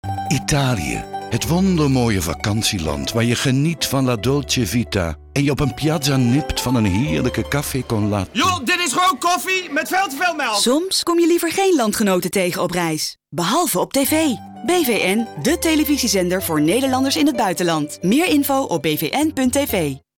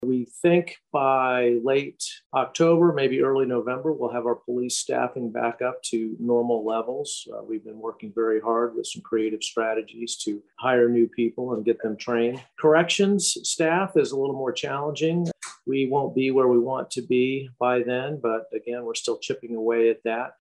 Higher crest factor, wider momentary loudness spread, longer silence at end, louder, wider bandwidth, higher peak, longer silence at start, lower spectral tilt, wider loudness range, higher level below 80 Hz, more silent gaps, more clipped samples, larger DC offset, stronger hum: second, 12 dB vs 18 dB; second, 5 LU vs 10 LU; about the same, 0.2 s vs 0.1 s; first, -18 LUFS vs -24 LUFS; first, 19 kHz vs 12 kHz; about the same, -8 dBFS vs -6 dBFS; about the same, 0.05 s vs 0 s; about the same, -4.5 dB/octave vs -4.5 dB/octave; second, 2 LU vs 5 LU; first, -40 dBFS vs -74 dBFS; second, none vs 2.26-2.30 s; neither; neither; neither